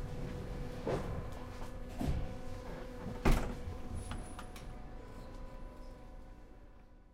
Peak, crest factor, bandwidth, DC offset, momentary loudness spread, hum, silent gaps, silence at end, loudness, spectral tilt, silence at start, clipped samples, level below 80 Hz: -14 dBFS; 24 dB; 15.5 kHz; under 0.1%; 18 LU; none; none; 0 s; -42 LUFS; -6.5 dB/octave; 0 s; under 0.1%; -42 dBFS